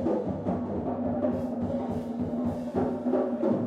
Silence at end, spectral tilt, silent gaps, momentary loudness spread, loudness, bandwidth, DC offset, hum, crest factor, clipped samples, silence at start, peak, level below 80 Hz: 0 s; -9.5 dB/octave; none; 4 LU; -30 LUFS; 7.4 kHz; under 0.1%; none; 14 dB; under 0.1%; 0 s; -14 dBFS; -52 dBFS